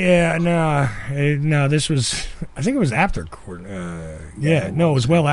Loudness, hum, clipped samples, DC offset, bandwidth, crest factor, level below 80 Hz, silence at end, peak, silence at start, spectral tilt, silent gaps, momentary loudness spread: -19 LUFS; none; under 0.1%; under 0.1%; 11.5 kHz; 16 dB; -36 dBFS; 0 s; -4 dBFS; 0 s; -6 dB/octave; none; 15 LU